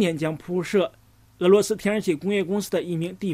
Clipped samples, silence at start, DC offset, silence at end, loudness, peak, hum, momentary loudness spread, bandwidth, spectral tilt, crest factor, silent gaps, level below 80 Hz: under 0.1%; 0 s; under 0.1%; 0 s; -24 LUFS; -6 dBFS; none; 9 LU; 16 kHz; -5.5 dB/octave; 18 dB; none; -60 dBFS